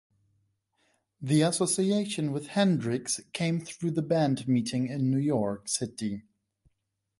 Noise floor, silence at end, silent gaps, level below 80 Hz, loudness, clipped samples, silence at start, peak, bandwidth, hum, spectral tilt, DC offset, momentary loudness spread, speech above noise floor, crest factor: -80 dBFS; 1 s; none; -68 dBFS; -28 LUFS; under 0.1%; 1.2 s; -12 dBFS; 11.5 kHz; none; -5 dB/octave; under 0.1%; 7 LU; 52 dB; 16 dB